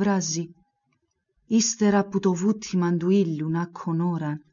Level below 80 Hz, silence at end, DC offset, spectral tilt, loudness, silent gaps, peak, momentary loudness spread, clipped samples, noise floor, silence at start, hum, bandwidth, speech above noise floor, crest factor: -66 dBFS; 0.15 s; under 0.1%; -5.5 dB/octave; -24 LUFS; none; -10 dBFS; 7 LU; under 0.1%; -73 dBFS; 0 s; none; 7.4 kHz; 50 dB; 14 dB